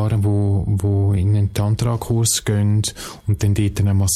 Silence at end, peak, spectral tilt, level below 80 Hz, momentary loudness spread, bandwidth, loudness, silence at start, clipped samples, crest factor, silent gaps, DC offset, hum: 0 s; -6 dBFS; -5.5 dB/octave; -38 dBFS; 3 LU; 15 kHz; -19 LUFS; 0 s; under 0.1%; 12 dB; none; under 0.1%; none